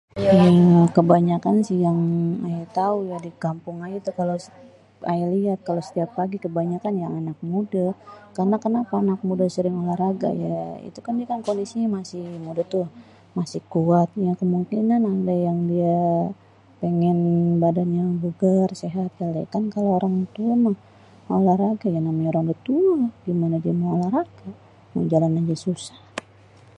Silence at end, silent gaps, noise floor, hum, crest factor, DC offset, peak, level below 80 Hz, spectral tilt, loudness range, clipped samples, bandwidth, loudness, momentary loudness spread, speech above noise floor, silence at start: 0.6 s; none; -50 dBFS; none; 20 dB; under 0.1%; -2 dBFS; -62 dBFS; -9 dB/octave; 5 LU; under 0.1%; 9.2 kHz; -22 LUFS; 11 LU; 29 dB; 0.15 s